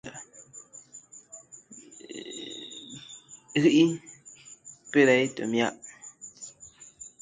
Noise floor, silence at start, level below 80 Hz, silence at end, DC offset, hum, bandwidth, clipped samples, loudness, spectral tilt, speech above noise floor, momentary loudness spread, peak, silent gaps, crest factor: -52 dBFS; 0.05 s; -72 dBFS; 0.15 s; under 0.1%; none; 9.6 kHz; under 0.1%; -25 LUFS; -4.5 dB/octave; 29 dB; 25 LU; -8 dBFS; none; 22 dB